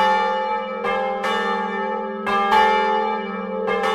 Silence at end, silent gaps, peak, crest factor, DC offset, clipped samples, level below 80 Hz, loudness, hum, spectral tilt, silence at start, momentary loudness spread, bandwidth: 0 s; none; -4 dBFS; 16 dB; under 0.1%; under 0.1%; -56 dBFS; -21 LUFS; none; -4.5 dB/octave; 0 s; 9 LU; 14 kHz